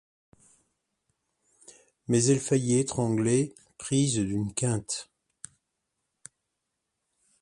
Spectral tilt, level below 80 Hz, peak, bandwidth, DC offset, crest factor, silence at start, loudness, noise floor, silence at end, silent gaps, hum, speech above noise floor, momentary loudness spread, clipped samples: -5.5 dB/octave; -60 dBFS; -10 dBFS; 11.5 kHz; under 0.1%; 20 dB; 2.1 s; -27 LUFS; -82 dBFS; 2.4 s; none; none; 57 dB; 23 LU; under 0.1%